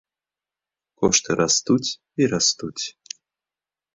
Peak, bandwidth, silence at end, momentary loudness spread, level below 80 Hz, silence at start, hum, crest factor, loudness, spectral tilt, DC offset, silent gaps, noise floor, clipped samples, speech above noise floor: -4 dBFS; 8.2 kHz; 1.05 s; 17 LU; -56 dBFS; 1 s; none; 20 dB; -21 LUFS; -3 dB/octave; under 0.1%; none; under -90 dBFS; under 0.1%; over 69 dB